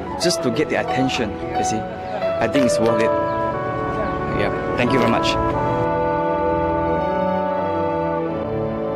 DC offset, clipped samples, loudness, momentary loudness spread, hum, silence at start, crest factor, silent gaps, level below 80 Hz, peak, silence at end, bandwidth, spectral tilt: under 0.1%; under 0.1%; -20 LUFS; 6 LU; none; 0 s; 14 dB; none; -40 dBFS; -6 dBFS; 0 s; 14.5 kHz; -5.5 dB/octave